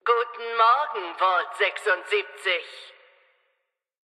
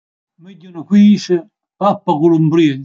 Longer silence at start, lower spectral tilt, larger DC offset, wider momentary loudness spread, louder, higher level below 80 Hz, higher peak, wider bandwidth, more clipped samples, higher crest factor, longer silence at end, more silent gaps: second, 0.05 s vs 0.45 s; second, 0.5 dB/octave vs -7.5 dB/octave; neither; about the same, 9 LU vs 11 LU; second, -24 LUFS vs -13 LUFS; second, under -90 dBFS vs -66 dBFS; second, -8 dBFS vs -2 dBFS; first, 12 kHz vs 7.4 kHz; neither; first, 18 dB vs 12 dB; first, 1.3 s vs 0 s; neither